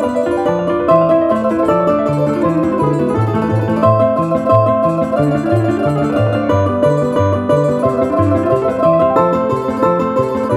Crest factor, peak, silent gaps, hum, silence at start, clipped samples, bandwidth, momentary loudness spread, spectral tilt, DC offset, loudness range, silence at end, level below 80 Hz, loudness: 14 dB; 0 dBFS; none; none; 0 s; under 0.1%; 12 kHz; 4 LU; -8.5 dB/octave; under 0.1%; 1 LU; 0 s; -42 dBFS; -14 LUFS